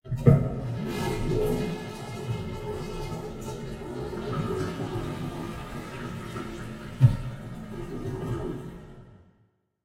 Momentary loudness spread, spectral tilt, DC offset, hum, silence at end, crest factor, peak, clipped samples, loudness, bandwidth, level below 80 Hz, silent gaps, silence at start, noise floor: 15 LU; -7.5 dB/octave; under 0.1%; none; 0.65 s; 26 dB; -4 dBFS; under 0.1%; -30 LUFS; 15.5 kHz; -42 dBFS; none; 0.05 s; -67 dBFS